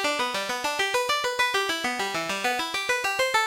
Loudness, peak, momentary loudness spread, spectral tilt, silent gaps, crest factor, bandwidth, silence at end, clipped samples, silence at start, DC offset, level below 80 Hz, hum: -25 LUFS; -10 dBFS; 4 LU; -1 dB/octave; none; 16 dB; 17 kHz; 0 s; under 0.1%; 0 s; under 0.1%; -62 dBFS; none